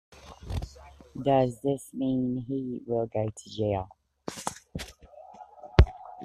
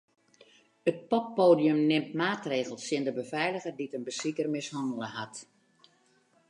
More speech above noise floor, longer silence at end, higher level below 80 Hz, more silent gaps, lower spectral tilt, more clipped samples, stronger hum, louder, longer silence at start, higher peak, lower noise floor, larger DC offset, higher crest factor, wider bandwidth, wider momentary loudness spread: second, 22 dB vs 38 dB; second, 0 s vs 1.05 s; first, -36 dBFS vs -80 dBFS; neither; first, -7 dB/octave vs -5 dB/octave; neither; neither; about the same, -29 LUFS vs -30 LUFS; second, 0.1 s vs 0.85 s; first, -2 dBFS vs -10 dBFS; second, -50 dBFS vs -67 dBFS; neither; first, 28 dB vs 20 dB; first, 14 kHz vs 11 kHz; first, 22 LU vs 13 LU